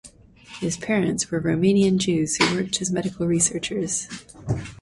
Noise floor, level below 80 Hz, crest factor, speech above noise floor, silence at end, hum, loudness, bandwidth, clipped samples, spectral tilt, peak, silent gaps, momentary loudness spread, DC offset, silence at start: -47 dBFS; -50 dBFS; 18 dB; 24 dB; 0.05 s; none; -22 LUFS; 11.5 kHz; under 0.1%; -4 dB/octave; -4 dBFS; none; 10 LU; under 0.1%; 0.05 s